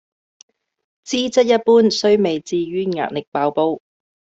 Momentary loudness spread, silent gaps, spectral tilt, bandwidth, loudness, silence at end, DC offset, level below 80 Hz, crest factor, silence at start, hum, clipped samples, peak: 10 LU; 3.27-3.32 s; -4.5 dB/octave; 8 kHz; -18 LUFS; 0.6 s; under 0.1%; -62 dBFS; 16 dB; 1.05 s; none; under 0.1%; -4 dBFS